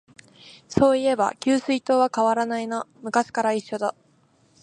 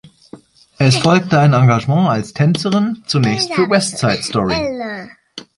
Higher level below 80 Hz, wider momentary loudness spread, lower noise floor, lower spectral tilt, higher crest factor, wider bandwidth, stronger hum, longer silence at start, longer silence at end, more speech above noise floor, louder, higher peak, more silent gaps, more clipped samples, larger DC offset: second, -56 dBFS vs -46 dBFS; second, 9 LU vs 12 LU; first, -61 dBFS vs -41 dBFS; about the same, -5 dB/octave vs -5.5 dB/octave; first, 20 dB vs 14 dB; about the same, 11 kHz vs 11.5 kHz; neither; first, 0.45 s vs 0.05 s; first, 0.7 s vs 0.15 s; first, 39 dB vs 27 dB; second, -23 LUFS vs -15 LUFS; second, -4 dBFS vs 0 dBFS; neither; neither; neither